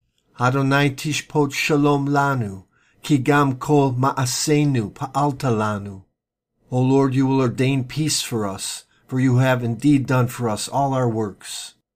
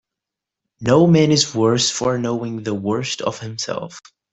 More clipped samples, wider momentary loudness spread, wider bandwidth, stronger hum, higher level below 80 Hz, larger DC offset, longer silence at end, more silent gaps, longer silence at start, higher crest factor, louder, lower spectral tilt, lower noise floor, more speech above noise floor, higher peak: neither; about the same, 11 LU vs 13 LU; first, 15.5 kHz vs 8.4 kHz; neither; about the same, -54 dBFS vs -54 dBFS; neither; about the same, 0.25 s vs 0.35 s; neither; second, 0.4 s vs 0.8 s; about the same, 16 dB vs 18 dB; about the same, -20 LUFS vs -18 LUFS; about the same, -5.5 dB/octave vs -5 dB/octave; second, -77 dBFS vs -85 dBFS; second, 58 dB vs 67 dB; second, -6 dBFS vs -2 dBFS